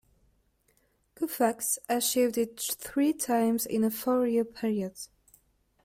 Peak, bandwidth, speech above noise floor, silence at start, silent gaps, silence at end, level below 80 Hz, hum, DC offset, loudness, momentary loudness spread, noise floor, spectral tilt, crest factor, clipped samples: -14 dBFS; 16.5 kHz; 42 dB; 1.2 s; none; 0.8 s; -68 dBFS; none; under 0.1%; -28 LUFS; 8 LU; -70 dBFS; -3.5 dB/octave; 16 dB; under 0.1%